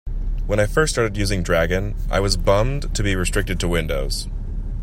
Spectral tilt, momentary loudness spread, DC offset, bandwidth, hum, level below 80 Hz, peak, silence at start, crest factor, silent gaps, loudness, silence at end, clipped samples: -4.5 dB/octave; 10 LU; under 0.1%; 15.5 kHz; none; -24 dBFS; -2 dBFS; 0.05 s; 18 dB; none; -21 LUFS; 0 s; under 0.1%